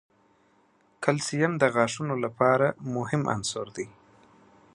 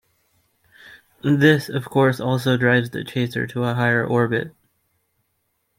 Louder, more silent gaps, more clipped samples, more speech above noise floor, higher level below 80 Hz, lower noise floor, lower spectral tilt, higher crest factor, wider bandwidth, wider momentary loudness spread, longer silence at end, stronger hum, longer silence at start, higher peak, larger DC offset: second, -26 LUFS vs -20 LUFS; neither; neither; second, 38 dB vs 52 dB; second, -66 dBFS vs -60 dBFS; second, -64 dBFS vs -71 dBFS; second, -5 dB/octave vs -7 dB/octave; about the same, 24 dB vs 20 dB; second, 11.5 kHz vs 16.5 kHz; about the same, 11 LU vs 9 LU; second, 0.85 s vs 1.3 s; neither; first, 1 s vs 0.85 s; about the same, -4 dBFS vs -2 dBFS; neither